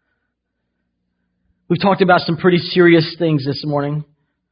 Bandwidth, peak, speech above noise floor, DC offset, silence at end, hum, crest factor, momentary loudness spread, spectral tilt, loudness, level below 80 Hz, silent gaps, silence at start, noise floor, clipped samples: 5.4 kHz; 0 dBFS; 59 dB; under 0.1%; 0.5 s; none; 18 dB; 10 LU; -11.5 dB/octave; -15 LUFS; -56 dBFS; none; 1.7 s; -74 dBFS; under 0.1%